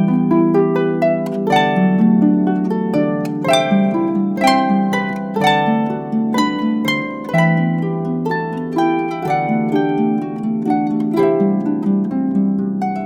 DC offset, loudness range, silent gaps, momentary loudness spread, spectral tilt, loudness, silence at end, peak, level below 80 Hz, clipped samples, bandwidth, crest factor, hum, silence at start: under 0.1%; 3 LU; none; 6 LU; -7 dB/octave; -17 LUFS; 0 s; 0 dBFS; -58 dBFS; under 0.1%; 15 kHz; 14 dB; none; 0 s